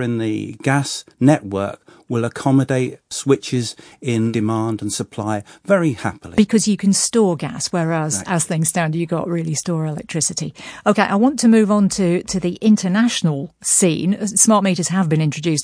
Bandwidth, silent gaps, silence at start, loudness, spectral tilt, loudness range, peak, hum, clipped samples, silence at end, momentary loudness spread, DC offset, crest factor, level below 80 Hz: 10.5 kHz; none; 0 s; -18 LUFS; -5 dB/octave; 4 LU; 0 dBFS; none; under 0.1%; 0 s; 10 LU; under 0.1%; 18 dB; -54 dBFS